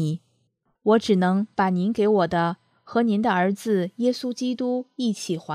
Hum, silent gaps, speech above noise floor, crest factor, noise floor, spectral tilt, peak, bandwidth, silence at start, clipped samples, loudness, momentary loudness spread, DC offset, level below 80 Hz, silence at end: none; none; 48 dB; 16 dB; -70 dBFS; -6.5 dB/octave; -6 dBFS; 14 kHz; 0 s; under 0.1%; -23 LUFS; 7 LU; under 0.1%; -64 dBFS; 0 s